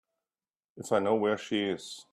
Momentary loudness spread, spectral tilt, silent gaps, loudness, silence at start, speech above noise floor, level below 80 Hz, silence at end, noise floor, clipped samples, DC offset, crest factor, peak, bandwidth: 10 LU; -4.5 dB/octave; none; -30 LUFS; 0.75 s; over 60 dB; -74 dBFS; 0.1 s; under -90 dBFS; under 0.1%; under 0.1%; 18 dB; -14 dBFS; 13.5 kHz